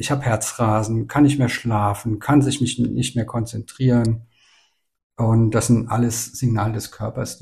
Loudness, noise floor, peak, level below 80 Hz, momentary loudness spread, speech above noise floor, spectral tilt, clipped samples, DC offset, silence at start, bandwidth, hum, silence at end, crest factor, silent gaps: -20 LUFS; -62 dBFS; -4 dBFS; -44 dBFS; 9 LU; 42 dB; -6 dB/octave; under 0.1%; under 0.1%; 0 s; 15 kHz; none; 0.05 s; 16 dB; 5.03-5.10 s